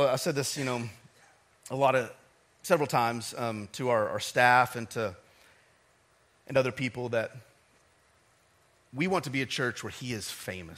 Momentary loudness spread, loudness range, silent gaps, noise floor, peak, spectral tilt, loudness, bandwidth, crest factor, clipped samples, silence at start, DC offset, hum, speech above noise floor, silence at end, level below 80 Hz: 13 LU; 7 LU; none; -66 dBFS; -8 dBFS; -4.5 dB/octave; -29 LUFS; 16 kHz; 24 dB; under 0.1%; 0 s; under 0.1%; none; 37 dB; 0 s; -70 dBFS